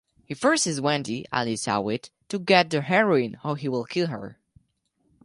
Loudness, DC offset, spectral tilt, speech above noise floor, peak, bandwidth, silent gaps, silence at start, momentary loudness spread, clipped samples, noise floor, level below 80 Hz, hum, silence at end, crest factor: -24 LUFS; under 0.1%; -4 dB/octave; 46 dB; -4 dBFS; 11.5 kHz; none; 0.3 s; 13 LU; under 0.1%; -71 dBFS; -66 dBFS; none; 0.9 s; 20 dB